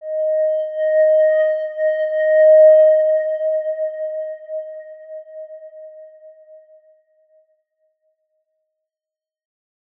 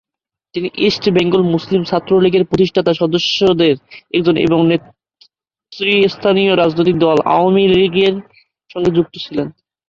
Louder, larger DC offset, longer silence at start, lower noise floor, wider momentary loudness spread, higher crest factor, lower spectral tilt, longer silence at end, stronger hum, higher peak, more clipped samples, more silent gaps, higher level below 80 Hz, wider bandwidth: about the same, -16 LUFS vs -14 LUFS; neither; second, 0 s vs 0.55 s; first, -90 dBFS vs -83 dBFS; first, 26 LU vs 10 LU; about the same, 14 dB vs 14 dB; second, -2 dB/octave vs -6.5 dB/octave; first, 3.7 s vs 0.4 s; neither; about the same, -4 dBFS vs -2 dBFS; neither; neither; second, under -90 dBFS vs -48 dBFS; second, 3.3 kHz vs 7 kHz